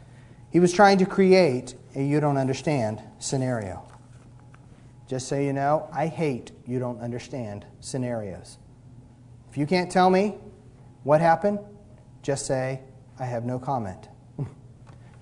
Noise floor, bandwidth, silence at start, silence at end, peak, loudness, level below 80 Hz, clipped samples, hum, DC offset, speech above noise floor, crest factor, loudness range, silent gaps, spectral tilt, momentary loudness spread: -49 dBFS; 11 kHz; 0 s; 0.3 s; -4 dBFS; -24 LUFS; -58 dBFS; under 0.1%; none; under 0.1%; 25 dB; 22 dB; 10 LU; none; -6 dB/octave; 19 LU